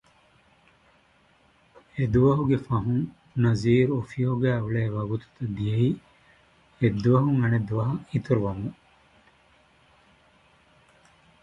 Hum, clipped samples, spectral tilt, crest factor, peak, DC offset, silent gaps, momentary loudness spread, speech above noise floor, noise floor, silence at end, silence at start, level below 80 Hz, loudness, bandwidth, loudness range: none; under 0.1%; -9 dB/octave; 18 dB; -8 dBFS; under 0.1%; none; 11 LU; 38 dB; -61 dBFS; 2.7 s; 1.95 s; -50 dBFS; -25 LUFS; 7.6 kHz; 7 LU